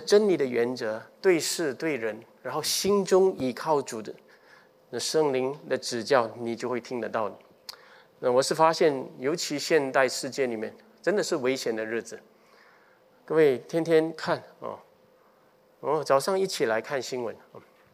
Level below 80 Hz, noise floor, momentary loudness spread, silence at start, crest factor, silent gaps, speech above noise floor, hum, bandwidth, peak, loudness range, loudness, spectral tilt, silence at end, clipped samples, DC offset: -76 dBFS; -61 dBFS; 15 LU; 0 s; 22 dB; none; 35 dB; none; 16 kHz; -6 dBFS; 3 LU; -27 LUFS; -4 dB/octave; 0.35 s; under 0.1%; under 0.1%